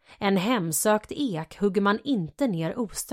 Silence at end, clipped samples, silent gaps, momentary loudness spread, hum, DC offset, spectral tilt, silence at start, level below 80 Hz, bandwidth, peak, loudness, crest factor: 0 s; under 0.1%; none; 6 LU; none; under 0.1%; -4.5 dB/octave; 0.1 s; -58 dBFS; 16 kHz; -10 dBFS; -26 LUFS; 16 dB